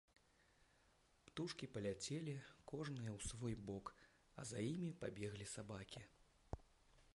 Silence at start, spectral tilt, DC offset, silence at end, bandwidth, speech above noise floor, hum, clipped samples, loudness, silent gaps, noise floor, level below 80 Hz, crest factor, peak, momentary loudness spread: 1.25 s; -5 dB/octave; under 0.1%; 0.05 s; 11.5 kHz; 27 dB; none; under 0.1%; -50 LUFS; none; -76 dBFS; -68 dBFS; 22 dB; -30 dBFS; 11 LU